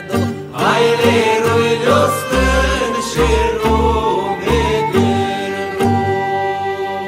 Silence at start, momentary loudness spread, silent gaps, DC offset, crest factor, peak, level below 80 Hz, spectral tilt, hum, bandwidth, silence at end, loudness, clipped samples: 0 s; 7 LU; none; under 0.1%; 14 dB; -2 dBFS; -26 dBFS; -5 dB/octave; none; 16 kHz; 0 s; -15 LUFS; under 0.1%